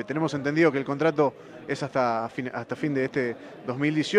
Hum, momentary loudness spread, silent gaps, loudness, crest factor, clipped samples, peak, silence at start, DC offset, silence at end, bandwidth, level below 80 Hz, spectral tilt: none; 11 LU; none; -26 LUFS; 18 dB; under 0.1%; -8 dBFS; 0 s; under 0.1%; 0 s; 10.5 kHz; -68 dBFS; -6.5 dB/octave